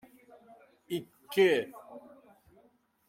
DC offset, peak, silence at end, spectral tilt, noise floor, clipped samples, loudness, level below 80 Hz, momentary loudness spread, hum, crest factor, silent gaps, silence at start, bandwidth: under 0.1%; -14 dBFS; 1.1 s; -5 dB/octave; -67 dBFS; under 0.1%; -30 LUFS; -80 dBFS; 25 LU; none; 20 dB; none; 0.9 s; 16.5 kHz